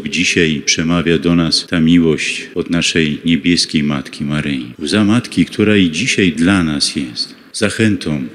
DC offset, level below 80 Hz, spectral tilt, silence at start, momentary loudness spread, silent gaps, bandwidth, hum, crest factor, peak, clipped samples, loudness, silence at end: under 0.1%; -40 dBFS; -4.5 dB/octave; 0 s; 8 LU; none; 12.5 kHz; none; 14 dB; 0 dBFS; under 0.1%; -14 LUFS; 0 s